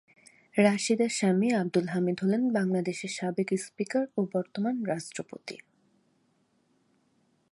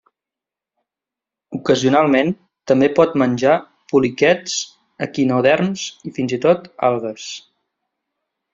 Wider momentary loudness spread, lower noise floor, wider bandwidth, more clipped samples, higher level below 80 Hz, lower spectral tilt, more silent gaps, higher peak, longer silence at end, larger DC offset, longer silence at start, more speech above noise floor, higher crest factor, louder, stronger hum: about the same, 13 LU vs 14 LU; second, -70 dBFS vs -87 dBFS; first, 11.5 kHz vs 7.8 kHz; neither; second, -78 dBFS vs -60 dBFS; about the same, -5.5 dB/octave vs -5 dB/octave; neither; second, -8 dBFS vs -2 dBFS; first, 1.95 s vs 1.15 s; neither; second, 0.55 s vs 1.5 s; second, 42 dB vs 70 dB; about the same, 22 dB vs 18 dB; second, -29 LUFS vs -17 LUFS; neither